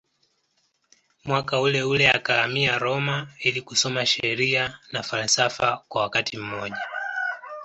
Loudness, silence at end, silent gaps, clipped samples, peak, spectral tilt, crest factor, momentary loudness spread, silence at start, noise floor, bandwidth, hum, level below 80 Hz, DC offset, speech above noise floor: -23 LUFS; 0 s; none; under 0.1%; -4 dBFS; -3 dB/octave; 22 dB; 11 LU; 1.25 s; -70 dBFS; 8.2 kHz; none; -60 dBFS; under 0.1%; 46 dB